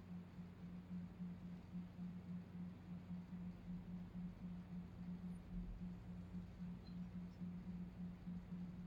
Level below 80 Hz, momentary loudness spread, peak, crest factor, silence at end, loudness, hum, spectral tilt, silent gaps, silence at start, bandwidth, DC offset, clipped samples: -62 dBFS; 3 LU; -40 dBFS; 12 dB; 0 s; -53 LUFS; none; -9 dB/octave; none; 0 s; 7.2 kHz; under 0.1%; under 0.1%